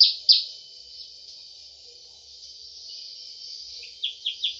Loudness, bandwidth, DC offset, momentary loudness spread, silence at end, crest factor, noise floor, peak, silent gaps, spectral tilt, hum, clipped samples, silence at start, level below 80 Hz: -22 LUFS; 8.2 kHz; under 0.1%; 26 LU; 0 s; 26 dB; -48 dBFS; -2 dBFS; none; 3 dB/octave; none; under 0.1%; 0 s; -72 dBFS